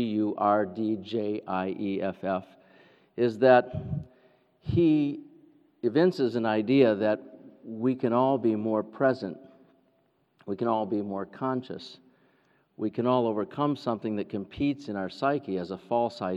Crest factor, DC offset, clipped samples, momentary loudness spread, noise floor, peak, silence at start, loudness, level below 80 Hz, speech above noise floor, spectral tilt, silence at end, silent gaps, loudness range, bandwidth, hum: 20 dB; under 0.1%; under 0.1%; 13 LU; -69 dBFS; -8 dBFS; 0 s; -28 LUFS; -60 dBFS; 42 dB; -8.5 dB/octave; 0 s; none; 6 LU; 8 kHz; none